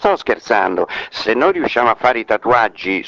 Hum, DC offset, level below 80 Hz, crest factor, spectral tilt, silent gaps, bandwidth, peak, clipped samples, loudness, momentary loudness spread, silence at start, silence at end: none; under 0.1%; -50 dBFS; 16 dB; -5 dB/octave; none; 7.6 kHz; 0 dBFS; under 0.1%; -16 LUFS; 5 LU; 0 s; 0 s